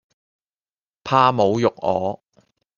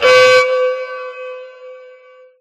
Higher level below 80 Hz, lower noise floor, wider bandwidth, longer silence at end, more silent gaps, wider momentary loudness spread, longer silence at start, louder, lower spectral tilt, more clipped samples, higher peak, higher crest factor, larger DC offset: about the same, -62 dBFS vs -62 dBFS; first, under -90 dBFS vs -43 dBFS; second, 7.2 kHz vs 13 kHz; about the same, 0.65 s vs 0.65 s; neither; second, 17 LU vs 24 LU; first, 1.05 s vs 0 s; second, -19 LUFS vs -11 LUFS; first, -6.5 dB/octave vs -1 dB/octave; neither; about the same, -2 dBFS vs 0 dBFS; first, 20 dB vs 14 dB; neither